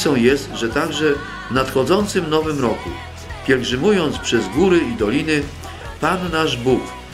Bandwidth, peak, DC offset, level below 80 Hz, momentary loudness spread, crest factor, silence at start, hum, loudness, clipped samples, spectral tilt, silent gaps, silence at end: 16 kHz; -2 dBFS; under 0.1%; -38 dBFS; 11 LU; 18 dB; 0 s; none; -18 LUFS; under 0.1%; -5 dB/octave; none; 0 s